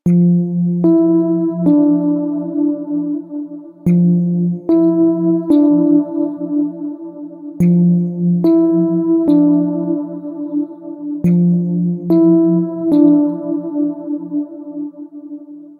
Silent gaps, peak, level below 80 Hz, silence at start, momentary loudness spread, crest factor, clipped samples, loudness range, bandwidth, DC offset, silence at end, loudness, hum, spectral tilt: none; -2 dBFS; -58 dBFS; 0.05 s; 15 LU; 14 dB; under 0.1%; 2 LU; 4.1 kHz; under 0.1%; 0.05 s; -15 LUFS; none; -12 dB/octave